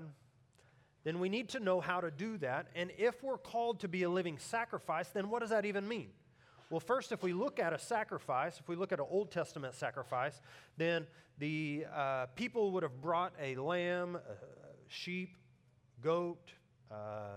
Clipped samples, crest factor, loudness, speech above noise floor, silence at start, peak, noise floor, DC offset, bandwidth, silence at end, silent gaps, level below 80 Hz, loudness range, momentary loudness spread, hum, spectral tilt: under 0.1%; 20 dB; -38 LUFS; 30 dB; 0 s; -20 dBFS; -69 dBFS; under 0.1%; 15.5 kHz; 0 s; none; -80 dBFS; 3 LU; 10 LU; none; -5.5 dB/octave